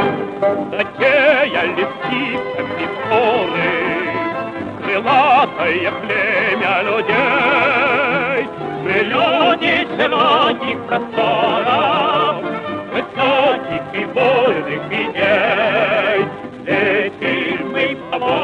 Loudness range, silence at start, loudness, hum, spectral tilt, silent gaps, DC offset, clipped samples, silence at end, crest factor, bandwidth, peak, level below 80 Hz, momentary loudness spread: 2 LU; 0 s; -16 LUFS; none; -6 dB/octave; none; under 0.1%; under 0.1%; 0 s; 14 dB; 9.8 kHz; -2 dBFS; -54 dBFS; 9 LU